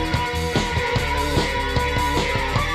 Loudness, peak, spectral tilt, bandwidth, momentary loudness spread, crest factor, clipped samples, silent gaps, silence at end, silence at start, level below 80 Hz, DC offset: -21 LUFS; -6 dBFS; -4.5 dB/octave; 15.5 kHz; 1 LU; 16 dB; under 0.1%; none; 0 s; 0 s; -28 dBFS; under 0.1%